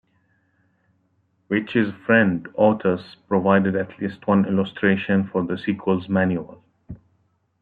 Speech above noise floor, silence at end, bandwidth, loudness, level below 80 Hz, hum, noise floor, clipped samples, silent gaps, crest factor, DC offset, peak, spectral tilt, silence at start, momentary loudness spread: 46 dB; 0.65 s; 4.6 kHz; -21 LUFS; -60 dBFS; none; -66 dBFS; under 0.1%; none; 20 dB; under 0.1%; -2 dBFS; -10 dB/octave; 1.5 s; 11 LU